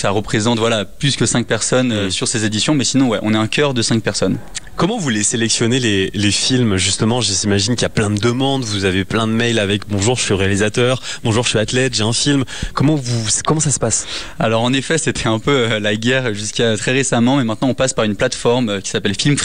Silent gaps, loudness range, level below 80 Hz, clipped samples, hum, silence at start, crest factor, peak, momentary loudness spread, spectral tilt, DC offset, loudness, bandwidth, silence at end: none; 1 LU; -42 dBFS; under 0.1%; none; 0 s; 12 dB; -4 dBFS; 4 LU; -4 dB/octave; 2%; -16 LUFS; 14 kHz; 0 s